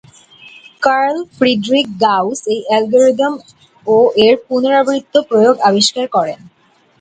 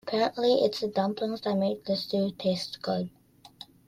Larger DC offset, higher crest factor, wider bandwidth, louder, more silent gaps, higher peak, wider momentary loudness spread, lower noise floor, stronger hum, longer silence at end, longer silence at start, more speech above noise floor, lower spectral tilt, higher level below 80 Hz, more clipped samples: neither; about the same, 14 dB vs 16 dB; second, 9.4 kHz vs 14.5 kHz; first, -13 LUFS vs -28 LUFS; neither; first, 0 dBFS vs -12 dBFS; about the same, 7 LU vs 8 LU; second, -41 dBFS vs -51 dBFS; neither; first, 0.65 s vs 0.25 s; first, 0.45 s vs 0.05 s; first, 28 dB vs 23 dB; second, -4 dB/octave vs -6 dB/octave; first, -58 dBFS vs -68 dBFS; neither